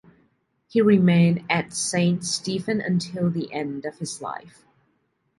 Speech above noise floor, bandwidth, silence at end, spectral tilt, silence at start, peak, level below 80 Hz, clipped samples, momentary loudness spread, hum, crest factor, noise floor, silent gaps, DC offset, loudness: 48 dB; 11.5 kHz; 0.9 s; -5.5 dB/octave; 0.75 s; -6 dBFS; -62 dBFS; under 0.1%; 14 LU; none; 18 dB; -70 dBFS; none; under 0.1%; -23 LUFS